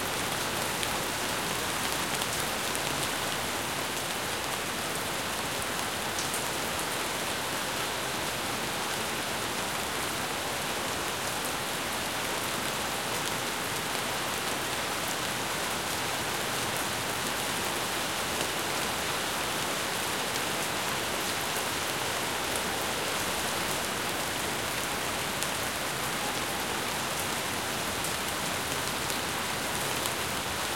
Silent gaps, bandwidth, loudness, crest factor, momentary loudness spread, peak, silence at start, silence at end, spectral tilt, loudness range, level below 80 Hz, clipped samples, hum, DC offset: none; 17 kHz; -30 LUFS; 24 dB; 1 LU; -8 dBFS; 0 s; 0 s; -2 dB/octave; 1 LU; -54 dBFS; under 0.1%; none; 0.2%